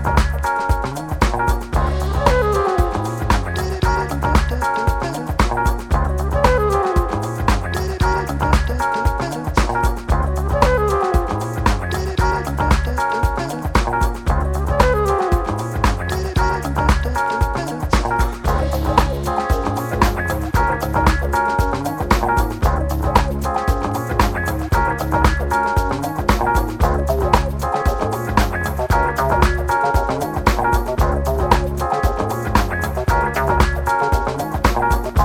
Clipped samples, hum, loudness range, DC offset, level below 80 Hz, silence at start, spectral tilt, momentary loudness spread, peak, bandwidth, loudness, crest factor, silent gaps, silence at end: under 0.1%; none; 1 LU; under 0.1%; -22 dBFS; 0 s; -6 dB/octave; 4 LU; 0 dBFS; 17 kHz; -19 LUFS; 18 dB; none; 0 s